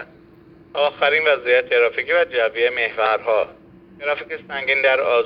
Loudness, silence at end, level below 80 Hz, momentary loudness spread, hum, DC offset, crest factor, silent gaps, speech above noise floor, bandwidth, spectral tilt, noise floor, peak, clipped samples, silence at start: -19 LUFS; 0 s; -60 dBFS; 10 LU; none; under 0.1%; 16 dB; none; 28 dB; 5.4 kHz; -5.5 dB/octave; -47 dBFS; -4 dBFS; under 0.1%; 0 s